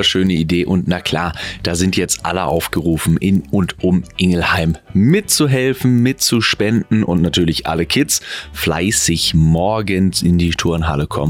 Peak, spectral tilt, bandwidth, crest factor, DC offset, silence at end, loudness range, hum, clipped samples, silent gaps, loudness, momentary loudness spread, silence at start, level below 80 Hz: -2 dBFS; -4.5 dB/octave; 17 kHz; 14 dB; under 0.1%; 0 s; 3 LU; none; under 0.1%; none; -15 LUFS; 5 LU; 0 s; -34 dBFS